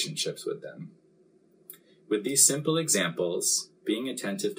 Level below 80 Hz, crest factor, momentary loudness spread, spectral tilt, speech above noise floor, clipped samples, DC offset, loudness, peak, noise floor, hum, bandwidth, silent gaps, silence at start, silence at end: -84 dBFS; 22 dB; 16 LU; -2.5 dB/octave; 34 dB; under 0.1%; under 0.1%; -26 LUFS; -6 dBFS; -62 dBFS; none; 16 kHz; none; 0 s; 0.05 s